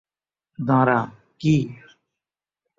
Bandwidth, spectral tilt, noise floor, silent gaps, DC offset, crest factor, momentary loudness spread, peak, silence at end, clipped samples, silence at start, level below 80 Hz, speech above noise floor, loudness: 7.6 kHz; -8 dB/octave; -89 dBFS; none; under 0.1%; 20 dB; 14 LU; -4 dBFS; 1.05 s; under 0.1%; 0.6 s; -56 dBFS; 69 dB; -21 LUFS